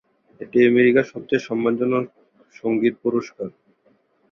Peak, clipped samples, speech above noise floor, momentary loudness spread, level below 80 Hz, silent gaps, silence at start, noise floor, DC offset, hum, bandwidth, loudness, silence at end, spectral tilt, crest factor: -4 dBFS; under 0.1%; 42 dB; 19 LU; -64 dBFS; none; 0.4 s; -62 dBFS; under 0.1%; none; 6.8 kHz; -20 LUFS; 0.8 s; -7 dB/octave; 18 dB